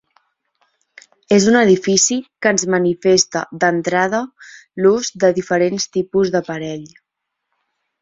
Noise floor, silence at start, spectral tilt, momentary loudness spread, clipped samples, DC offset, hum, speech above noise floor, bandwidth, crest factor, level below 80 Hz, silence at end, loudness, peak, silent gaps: -78 dBFS; 1.3 s; -3.5 dB/octave; 11 LU; under 0.1%; under 0.1%; none; 62 dB; 8 kHz; 16 dB; -58 dBFS; 1.15 s; -16 LUFS; 0 dBFS; none